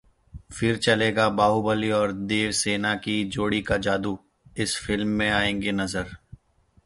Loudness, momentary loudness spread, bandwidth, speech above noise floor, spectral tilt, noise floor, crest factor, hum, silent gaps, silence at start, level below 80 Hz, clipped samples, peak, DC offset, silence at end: -24 LUFS; 9 LU; 11.5 kHz; 37 dB; -4 dB/octave; -61 dBFS; 20 dB; none; none; 0.35 s; -48 dBFS; under 0.1%; -6 dBFS; under 0.1%; 0.7 s